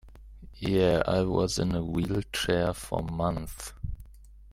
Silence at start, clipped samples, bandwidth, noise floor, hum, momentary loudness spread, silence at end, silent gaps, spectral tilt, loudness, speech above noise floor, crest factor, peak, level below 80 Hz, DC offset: 0.05 s; under 0.1%; 16 kHz; -50 dBFS; none; 15 LU; 0 s; none; -5.5 dB/octave; -28 LUFS; 22 dB; 20 dB; -10 dBFS; -44 dBFS; under 0.1%